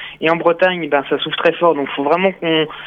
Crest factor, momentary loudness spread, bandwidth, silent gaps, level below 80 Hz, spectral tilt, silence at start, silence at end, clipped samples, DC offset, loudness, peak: 16 dB; 4 LU; 5.8 kHz; none; -58 dBFS; -7 dB/octave; 0 s; 0 s; under 0.1%; under 0.1%; -16 LUFS; -2 dBFS